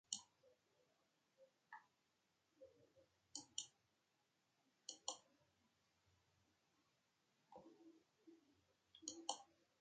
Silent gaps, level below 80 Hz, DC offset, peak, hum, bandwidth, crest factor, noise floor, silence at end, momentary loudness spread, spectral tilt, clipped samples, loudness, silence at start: none; under -90 dBFS; under 0.1%; -24 dBFS; none; 9 kHz; 36 dB; -86 dBFS; 0.3 s; 17 LU; 0 dB/octave; under 0.1%; -54 LUFS; 0.1 s